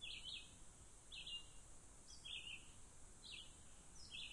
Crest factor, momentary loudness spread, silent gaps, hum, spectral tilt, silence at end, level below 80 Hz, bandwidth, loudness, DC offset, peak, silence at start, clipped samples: 16 dB; 12 LU; none; none; -0.5 dB/octave; 0 s; -66 dBFS; 11.5 kHz; -55 LUFS; under 0.1%; -40 dBFS; 0 s; under 0.1%